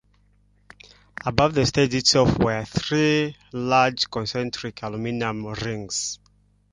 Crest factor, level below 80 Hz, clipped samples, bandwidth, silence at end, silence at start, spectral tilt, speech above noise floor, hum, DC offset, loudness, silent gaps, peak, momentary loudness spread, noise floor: 22 dB; -46 dBFS; under 0.1%; 11 kHz; 0.6 s; 1.25 s; -4.5 dB/octave; 38 dB; 50 Hz at -45 dBFS; under 0.1%; -23 LUFS; none; -2 dBFS; 12 LU; -60 dBFS